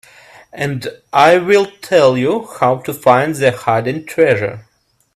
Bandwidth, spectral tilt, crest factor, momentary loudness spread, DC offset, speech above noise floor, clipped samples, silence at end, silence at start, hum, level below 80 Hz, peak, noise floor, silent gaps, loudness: 14 kHz; -5.5 dB/octave; 14 dB; 11 LU; under 0.1%; 29 dB; under 0.1%; 0.55 s; 0.55 s; none; -56 dBFS; 0 dBFS; -43 dBFS; none; -14 LUFS